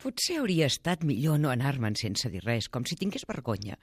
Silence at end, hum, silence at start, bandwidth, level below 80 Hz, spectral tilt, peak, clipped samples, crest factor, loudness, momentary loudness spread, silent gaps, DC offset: 0.1 s; none; 0 s; 15.5 kHz; -58 dBFS; -5 dB/octave; -12 dBFS; under 0.1%; 16 dB; -29 LUFS; 7 LU; none; under 0.1%